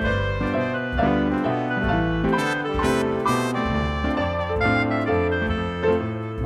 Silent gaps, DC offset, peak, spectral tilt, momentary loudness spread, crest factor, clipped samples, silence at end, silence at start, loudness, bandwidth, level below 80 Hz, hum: none; under 0.1%; -8 dBFS; -6.5 dB/octave; 3 LU; 14 dB; under 0.1%; 0 s; 0 s; -23 LUFS; 15 kHz; -34 dBFS; none